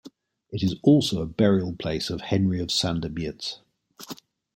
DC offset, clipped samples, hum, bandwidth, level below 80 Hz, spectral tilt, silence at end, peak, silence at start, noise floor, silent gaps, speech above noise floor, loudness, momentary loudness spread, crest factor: under 0.1%; under 0.1%; none; 16.5 kHz; -52 dBFS; -6 dB/octave; 0.4 s; -6 dBFS; 0.05 s; -50 dBFS; none; 26 dB; -24 LUFS; 21 LU; 18 dB